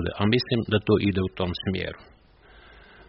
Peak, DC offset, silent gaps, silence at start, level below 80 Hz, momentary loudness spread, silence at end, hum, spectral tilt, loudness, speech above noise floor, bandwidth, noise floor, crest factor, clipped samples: -8 dBFS; under 0.1%; none; 0 s; -48 dBFS; 9 LU; 1.05 s; none; -5 dB/octave; -25 LUFS; 29 dB; 5.8 kHz; -53 dBFS; 18 dB; under 0.1%